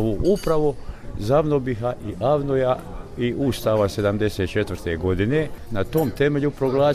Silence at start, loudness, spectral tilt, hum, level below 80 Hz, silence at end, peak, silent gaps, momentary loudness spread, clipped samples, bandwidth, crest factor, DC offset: 0 s; -22 LUFS; -7 dB/octave; none; -38 dBFS; 0 s; -8 dBFS; none; 7 LU; under 0.1%; 15.5 kHz; 14 dB; under 0.1%